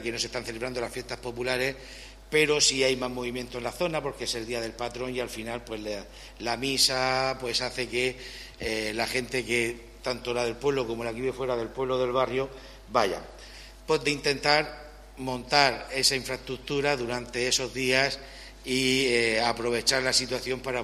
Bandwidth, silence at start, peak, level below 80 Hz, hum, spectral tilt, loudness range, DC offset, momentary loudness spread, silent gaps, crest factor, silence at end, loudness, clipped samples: 14.5 kHz; 0 s; -4 dBFS; -50 dBFS; none; -2.5 dB/octave; 4 LU; under 0.1%; 14 LU; none; 26 dB; 0 s; -27 LUFS; under 0.1%